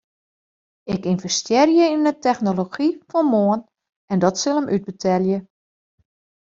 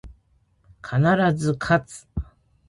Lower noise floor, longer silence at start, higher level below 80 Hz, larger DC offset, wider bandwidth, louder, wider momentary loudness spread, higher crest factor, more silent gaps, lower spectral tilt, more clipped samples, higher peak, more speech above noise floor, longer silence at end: first, under -90 dBFS vs -63 dBFS; first, 0.85 s vs 0.05 s; second, -60 dBFS vs -42 dBFS; neither; second, 7.8 kHz vs 11.5 kHz; about the same, -20 LUFS vs -22 LUFS; second, 10 LU vs 18 LU; about the same, 18 dB vs 18 dB; first, 3.96-4.08 s vs none; second, -5 dB/octave vs -7 dB/octave; neither; first, -2 dBFS vs -6 dBFS; first, over 71 dB vs 41 dB; first, 1.05 s vs 0.45 s